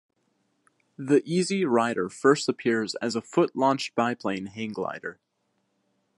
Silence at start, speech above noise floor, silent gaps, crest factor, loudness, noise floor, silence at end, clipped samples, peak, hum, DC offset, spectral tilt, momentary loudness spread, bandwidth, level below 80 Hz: 1 s; 49 dB; none; 20 dB; -26 LUFS; -74 dBFS; 1.05 s; under 0.1%; -6 dBFS; none; under 0.1%; -5 dB/octave; 10 LU; 11.5 kHz; -72 dBFS